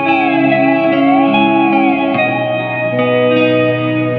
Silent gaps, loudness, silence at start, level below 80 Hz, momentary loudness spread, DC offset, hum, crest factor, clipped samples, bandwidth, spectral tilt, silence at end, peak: none; -12 LUFS; 0 s; -58 dBFS; 4 LU; under 0.1%; none; 12 dB; under 0.1%; 5 kHz; -9 dB/octave; 0 s; 0 dBFS